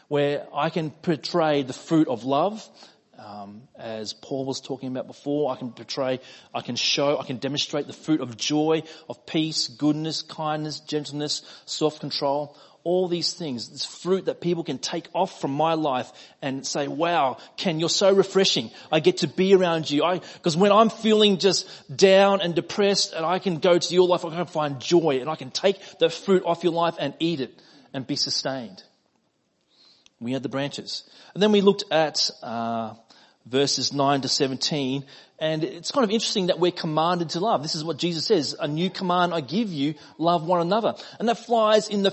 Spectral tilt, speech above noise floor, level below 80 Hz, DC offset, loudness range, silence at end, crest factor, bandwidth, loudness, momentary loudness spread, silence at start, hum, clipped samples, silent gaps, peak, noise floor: -4.5 dB/octave; 46 dB; -72 dBFS; under 0.1%; 8 LU; 0 s; 20 dB; 8.6 kHz; -24 LUFS; 13 LU; 0.1 s; none; under 0.1%; none; -4 dBFS; -70 dBFS